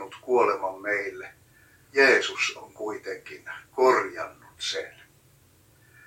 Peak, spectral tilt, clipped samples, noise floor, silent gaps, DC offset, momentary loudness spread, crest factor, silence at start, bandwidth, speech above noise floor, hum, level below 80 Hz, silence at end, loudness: -6 dBFS; -2.5 dB/octave; under 0.1%; -59 dBFS; none; under 0.1%; 19 LU; 22 dB; 0 s; 16.5 kHz; 33 dB; none; -70 dBFS; 1.15 s; -25 LUFS